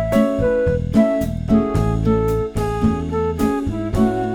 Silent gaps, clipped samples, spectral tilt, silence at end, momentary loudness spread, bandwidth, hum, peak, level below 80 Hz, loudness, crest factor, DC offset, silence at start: none; under 0.1%; -8 dB/octave; 0 s; 5 LU; 18 kHz; none; -4 dBFS; -30 dBFS; -19 LUFS; 14 dB; under 0.1%; 0 s